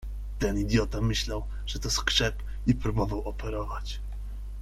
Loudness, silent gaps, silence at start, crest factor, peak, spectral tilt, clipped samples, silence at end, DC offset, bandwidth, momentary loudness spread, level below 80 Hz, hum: -29 LUFS; none; 0 s; 20 dB; -8 dBFS; -4.5 dB/octave; under 0.1%; 0 s; under 0.1%; 14 kHz; 13 LU; -34 dBFS; none